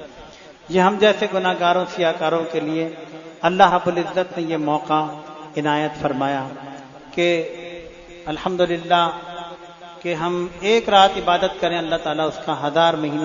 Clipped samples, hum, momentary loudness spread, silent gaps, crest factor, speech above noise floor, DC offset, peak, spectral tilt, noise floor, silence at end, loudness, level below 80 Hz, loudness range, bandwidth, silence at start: under 0.1%; none; 20 LU; none; 20 dB; 23 dB; under 0.1%; 0 dBFS; -5 dB/octave; -42 dBFS; 0 s; -20 LUFS; -54 dBFS; 5 LU; 7.4 kHz; 0 s